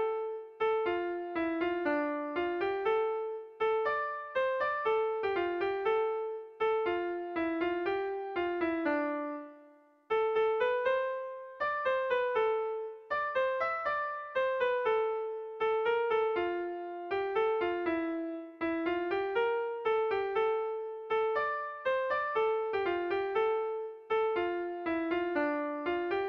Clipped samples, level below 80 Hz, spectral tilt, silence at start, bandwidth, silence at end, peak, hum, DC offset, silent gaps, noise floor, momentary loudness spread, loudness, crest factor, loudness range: under 0.1%; -68 dBFS; -6 dB/octave; 0 s; 5.8 kHz; 0 s; -20 dBFS; none; under 0.1%; none; -60 dBFS; 7 LU; -32 LUFS; 12 dB; 1 LU